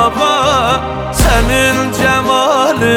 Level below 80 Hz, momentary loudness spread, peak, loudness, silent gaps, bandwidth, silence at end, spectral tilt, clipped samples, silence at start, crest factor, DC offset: -22 dBFS; 4 LU; 0 dBFS; -11 LUFS; none; 20 kHz; 0 s; -4 dB/octave; under 0.1%; 0 s; 12 dB; under 0.1%